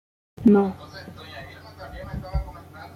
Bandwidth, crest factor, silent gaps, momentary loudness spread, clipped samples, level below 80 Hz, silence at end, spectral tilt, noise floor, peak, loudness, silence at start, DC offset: 6.6 kHz; 20 dB; none; 23 LU; under 0.1%; -40 dBFS; 0.1 s; -8.5 dB/octave; -41 dBFS; -6 dBFS; -23 LUFS; 0.4 s; under 0.1%